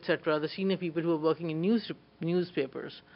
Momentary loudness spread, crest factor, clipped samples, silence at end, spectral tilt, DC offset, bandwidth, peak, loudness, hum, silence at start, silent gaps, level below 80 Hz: 8 LU; 18 dB; under 0.1%; 0.15 s; -9.5 dB/octave; under 0.1%; 5.6 kHz; -12 dBFS; -31 LUFS; none; 0 s; none; -74 dBFS